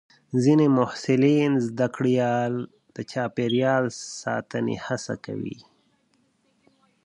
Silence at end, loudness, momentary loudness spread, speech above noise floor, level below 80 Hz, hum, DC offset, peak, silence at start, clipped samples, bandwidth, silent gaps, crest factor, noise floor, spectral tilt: 1.5 s; -24 LUFS; 14 LU; 44 dB; -66 dBFS; none; under 0.1%; -6 dBFS; 0.3 s; under 0.1%; 10.5 kHz; none; 18 dB; -67 dBFS; -6.5 dB/octave